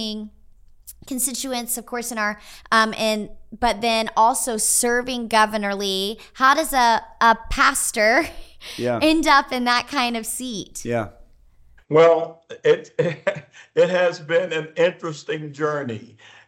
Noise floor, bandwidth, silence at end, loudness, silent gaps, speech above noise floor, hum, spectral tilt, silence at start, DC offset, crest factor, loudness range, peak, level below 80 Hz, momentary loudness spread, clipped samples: -51 dBFS; 17 kHz; 0.4 s; -20 LUFS; none; 30 dB; none; -2.5 dB/octave; 0 s; under 0.1%; 18 dB; 4 LU; -2 dBFS; -44 dBFS; 13 LU; under 0.1%